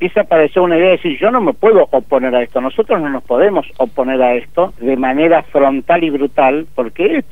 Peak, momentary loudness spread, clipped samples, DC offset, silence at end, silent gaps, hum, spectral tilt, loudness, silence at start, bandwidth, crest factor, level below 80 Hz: 0 dBFS; 6 LU; under 0.1%; 3%; 0.1 s; none; none; -7.5 dB/octave; -13 LUFS; 0 s; 4.1 kHz; 12 dB; -46 dBFS